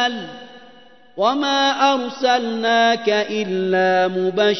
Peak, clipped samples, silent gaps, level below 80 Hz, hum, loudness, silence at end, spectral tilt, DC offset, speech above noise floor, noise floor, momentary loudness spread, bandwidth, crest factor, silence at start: -2 dBFS; under 0.1%; none; -68 dBFS; none; -18 LUFS; 0 s; -4 dB/octave; 0.3%; 30 dB; -48 dBFS; 9 LU; 6.2 kHz; 16 dB; 0 s